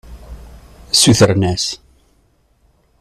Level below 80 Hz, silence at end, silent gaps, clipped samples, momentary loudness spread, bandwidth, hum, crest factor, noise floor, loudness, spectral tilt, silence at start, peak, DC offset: -38 dBFS; 1.25 s; none; under 0.1%; 12 LU; 14 kHz; none; 18 dB; -57 dBFS; -13 LUFS; -4 dB/octave; 0.1 s; 0 dBFS; under 0.1%